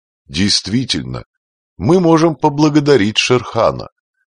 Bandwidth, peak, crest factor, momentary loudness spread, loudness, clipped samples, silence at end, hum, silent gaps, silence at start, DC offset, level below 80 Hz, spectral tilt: 10 kHz; 0 dBFS; 14 dB; 13 LU; -14 LUFS; under 0.1%; 0.45 s; none; 1.26-1.76 s; 0.3 s; under 0.1%; -44 dBFS; -5 dB/octave